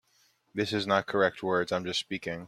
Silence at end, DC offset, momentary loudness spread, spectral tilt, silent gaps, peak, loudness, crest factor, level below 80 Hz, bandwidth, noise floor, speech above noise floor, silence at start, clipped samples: 0 s; under 0.1%; 7 LU; -4.5 dB/octave; none; -10 dBFS; -29 LUFS; 22 dB; -68 dBFS; 14.5 kHz; -68 dBFS; 39 dB; 0.55 s; under 0.1%